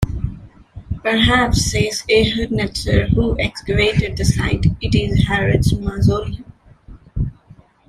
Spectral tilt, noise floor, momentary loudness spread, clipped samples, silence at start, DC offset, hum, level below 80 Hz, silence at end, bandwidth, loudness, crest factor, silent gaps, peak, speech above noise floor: -5.5 dB/octave; -47 dBFS; 11 LU; under 0.1%; 0 s; under 0.1%; none; -28 dBFS; 0.55 s; 14.5 kHz; -17 LUFS; 16 dB; none; -2 dBFS; 31 dB